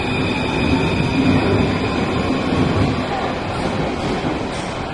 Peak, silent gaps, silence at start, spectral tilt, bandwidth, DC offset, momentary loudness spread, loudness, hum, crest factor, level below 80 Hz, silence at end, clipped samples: -4 dBFS; none; 0 s; -6.5 dB/octave; 11.5 kHz; under 0.1%; 6 LU; -19 LUFS; none; 16 dB; -34 dBFS; 0 s; under 0.1%